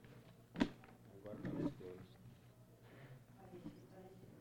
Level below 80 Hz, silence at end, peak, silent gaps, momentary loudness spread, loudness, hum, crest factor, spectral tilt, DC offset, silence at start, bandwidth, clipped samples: -68 dBFS; 0 s; -22 dBFS; none; 20 LU; -48 LUFS; none; 28 dB; -7 dB/octave; under 0.1%; 0 s; 19 kHz; under 0.1%